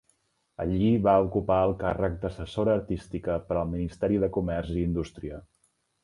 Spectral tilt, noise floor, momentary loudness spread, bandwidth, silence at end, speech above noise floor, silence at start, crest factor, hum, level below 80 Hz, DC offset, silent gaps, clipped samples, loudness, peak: -8.5 dB/octave; -71 dBFS; 12 LU; 11 kHz; 0.65 s; 44 dB; 0.6 s; 18 dB; none; -44 dBFS; under 0.1%; none; under 0.1%; -27 LUFS; -8 dBFS